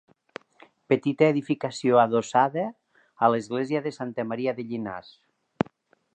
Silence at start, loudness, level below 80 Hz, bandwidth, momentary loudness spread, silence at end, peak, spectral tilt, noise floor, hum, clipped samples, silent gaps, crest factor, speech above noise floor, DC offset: 0.9 s; -25 LUFS; -68 dBFS; 9.2 kHz; 15 LU; 1.15 s; -4 dBFS; -6.5 dB/octave; -58 dBFS; none; under 0.1%; none; 22 dB; 33 dB; under 0.1%